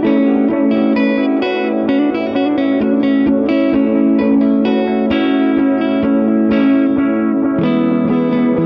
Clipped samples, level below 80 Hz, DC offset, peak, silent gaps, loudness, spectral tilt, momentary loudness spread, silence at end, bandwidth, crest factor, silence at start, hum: under 0.1%; -48 dBFS; under 0.1%; -2 dBFS; none; -14 LUFS; -9.5 dB/octave; 3 LU; 0 s; 5.2 kHz; 10 dB; 0 s; none